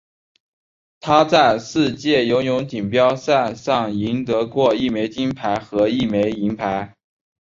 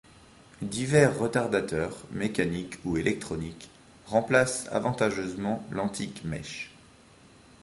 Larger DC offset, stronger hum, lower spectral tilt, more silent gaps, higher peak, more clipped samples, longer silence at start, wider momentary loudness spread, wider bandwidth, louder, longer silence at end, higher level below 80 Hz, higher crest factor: neither; neither; about the same, -5.5 dB/octave vs -5 dB/octave; neither; first, -2 dBFS vs -6 dBFS; neither; first, 1.05 s vs 0.6 s; second, 8 LU vs 14 LU; second, 7.6 kHz vs 11.5 kHz; first, -19 LUFS vs -28 LUFS; second, 0.7 s vs 0.9 s; about the same, -52 dBFS vs -54 dBFS; about the same, 18 dB vs 22 dB